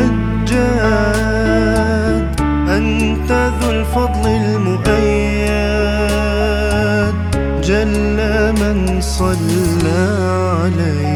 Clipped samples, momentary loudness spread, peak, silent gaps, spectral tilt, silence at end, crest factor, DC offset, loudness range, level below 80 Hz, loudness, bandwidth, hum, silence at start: under 0.1%; 3 LU; 0 dBFS; none; -6 dB/octave; 0 s; 14 dB; under 0.1%; 1 LU; -22 dBFS; -15 LUFS; 15.5 kHz; none; 0 s